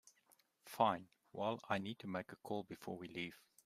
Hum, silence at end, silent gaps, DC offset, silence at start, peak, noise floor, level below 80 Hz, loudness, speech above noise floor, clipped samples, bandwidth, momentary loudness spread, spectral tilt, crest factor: none; 0.3 s; none; under 0.1%; 0.65 s; -20 dBFS; -75 dBFS; -82 dBFS; -43 LUFS; 33 dB; under 0.1%; 15.5 kHz; 12 LU; -5.5 dB/octave; 24 dB